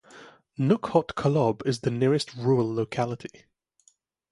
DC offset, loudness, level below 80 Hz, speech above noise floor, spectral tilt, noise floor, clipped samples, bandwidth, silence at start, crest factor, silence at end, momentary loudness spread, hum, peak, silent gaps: under 0.1%; -26 LUFS; -60 dBFS; 40 dB; -7 dB/octave; -65 dBFS; under 0.1%; 11.5 kHz; 0.15 s; 20 dB; 1.05 s; 8 LU; none; -6 dBFS; none